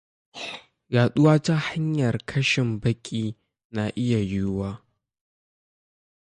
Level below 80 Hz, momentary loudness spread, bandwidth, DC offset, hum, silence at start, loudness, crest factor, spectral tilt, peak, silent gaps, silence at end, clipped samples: -52 dBFS; 16 LU; 10 kHz; under 0.1%; none; 0.35 s; -24 LUFS; 18 dB; -6.5 dB/octave; -8 dBFS; 3.65-3.70 s; 1.6 s; under 0.1%